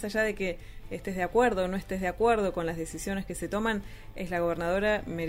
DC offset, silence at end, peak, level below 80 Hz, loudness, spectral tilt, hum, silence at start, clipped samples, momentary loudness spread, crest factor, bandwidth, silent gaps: under 0.1%; 0 s; -12 dBFS; -46 dBFS; -30 LUFS; -5.5 dB/octave; none; 0 s; under 0.1%; 11 LU; 18 dB; 16 kHz; none